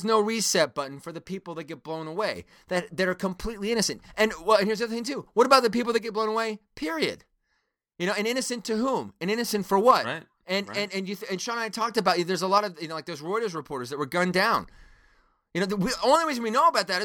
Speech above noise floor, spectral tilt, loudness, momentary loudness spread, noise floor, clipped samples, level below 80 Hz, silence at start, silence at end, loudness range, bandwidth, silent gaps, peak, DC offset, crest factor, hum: 50 dB; -3.5 dB/octave; -26 LUFS; 13 LU; -76 dBFS; under 0.1%; -56 dBFS; 0 s; 0 s; 5 LU; 19.5 kHz; none; -4 dBFS; under 0.1%; 22 dB; none